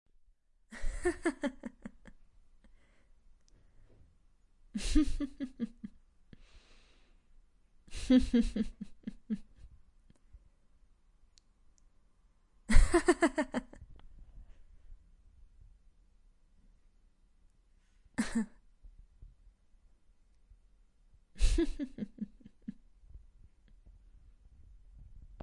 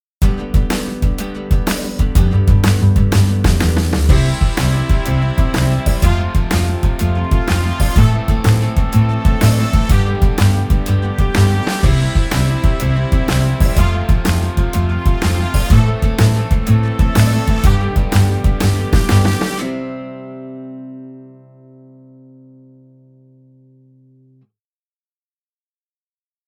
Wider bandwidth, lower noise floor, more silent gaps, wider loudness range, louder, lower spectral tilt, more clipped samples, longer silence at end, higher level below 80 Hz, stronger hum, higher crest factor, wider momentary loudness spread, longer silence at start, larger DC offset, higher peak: second, 11.5 kHz vs over 20 kHz; second, -67 dBFS vs under -90 dBFS; neither; first, 15 LU vs 4 LU; second, -34 LUFS vs -15 LUFS; about the same, -5.5 dB/octave vs -6 dB/octave; neither; second, 0.25 s vs 5.2 s; second, -40 dBFS vs -18 dBFS; neither; first, 28 dB vs 14 dB; first, 22 LU vs 7 LU; first, 0.7 s vs 0.2 s; neither; second, -8 dBFS vs 0 dBFS